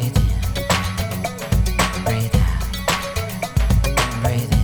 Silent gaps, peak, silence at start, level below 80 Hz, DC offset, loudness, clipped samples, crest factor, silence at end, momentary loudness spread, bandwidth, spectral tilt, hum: none; -2 dBFS; 0 s; -24 dBFS; under 0.1%; -20 LUFS; under 0.1%; 18 dB; 0 s; 5 LU; over 20 kHz; -5 dB/octave; none